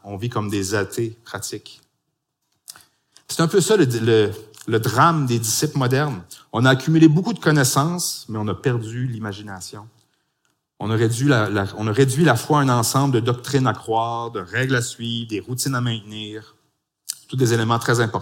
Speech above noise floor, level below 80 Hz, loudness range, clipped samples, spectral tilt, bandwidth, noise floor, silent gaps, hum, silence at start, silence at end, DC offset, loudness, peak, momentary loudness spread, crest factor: 56 dB; -60 dBFS; 7 LU; under 0.1%; -5 dB/octave; 17 kHz; -75 dBFS; none; none; 0.05 s; 0 s; under 0.1%; -20 LUFS; -2 dBFS; 14 LU; 20 dB